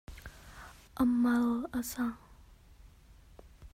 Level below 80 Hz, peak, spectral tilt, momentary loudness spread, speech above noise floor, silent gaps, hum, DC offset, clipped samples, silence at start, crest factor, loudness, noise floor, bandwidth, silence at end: -56 dBFS; -18 dBFS; -5 dB/octave; 23 LU; 27 dB; none; none; under 0.1%; under 0.1%; 0.1 s; 16 dB; -31 LUFS; -58 dBFS; 16 kHz; 0.05 s